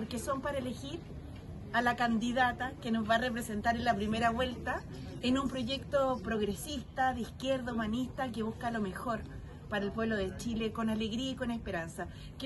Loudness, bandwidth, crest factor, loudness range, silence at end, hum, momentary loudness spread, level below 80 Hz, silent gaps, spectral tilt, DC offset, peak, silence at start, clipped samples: -34 LUFS; 12.5 kHz; 20 dB; 4 LU; 0 s; none; 11 LU; -52 dBFS; none; -5 dB/octave; under 0.1%; -16 dBFS; 0 s; under 0.1%